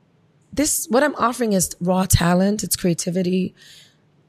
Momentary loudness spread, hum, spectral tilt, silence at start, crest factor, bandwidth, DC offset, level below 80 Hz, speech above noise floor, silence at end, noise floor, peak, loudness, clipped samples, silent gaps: 6 LU; none; -4.5 dB/octave; 0.5 s; 18 dB; 15.5 kHz; under 0.1%; -40 dBFS; 39 dB; 0.8 s; -58 dBFS; -2 dBFS; -20 LUFS; under 0.1%; none